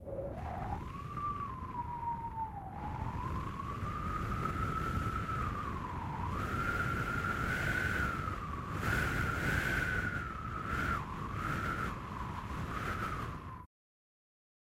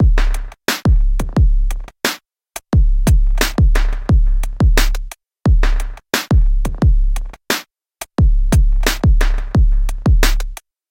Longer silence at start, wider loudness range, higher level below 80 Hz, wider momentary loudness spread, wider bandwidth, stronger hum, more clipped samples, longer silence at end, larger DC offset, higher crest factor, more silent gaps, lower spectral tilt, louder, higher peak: about the same, 0 s vs 0 s; first, 6 LU vs 1 LU; second, -46 dBFS vs -14 dBFS; about the same, 8 LU vs 10 LU; about the same, 16 kHz vs 16.5 kHz; neither; neither; first, 1 s vs 0.35 s; neither; about the same, 18 dB vs 14 dB; neither; about the same, -6 dB/octave vs -5 dB/octave; second, -37 LUFS vs -17 LUFS; second, -20 dBFS vs 0 dBFS